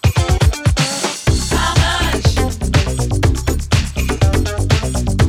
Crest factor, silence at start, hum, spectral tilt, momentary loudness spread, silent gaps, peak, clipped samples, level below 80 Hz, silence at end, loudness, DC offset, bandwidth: 14 dB; 0.05 s; none; -4.5 dB/octave; 3 LU; none; 0 dBFS; under 0.1%; -20 dBFS; 0 s; -16 LUFS; under 0.1%; 16 kHz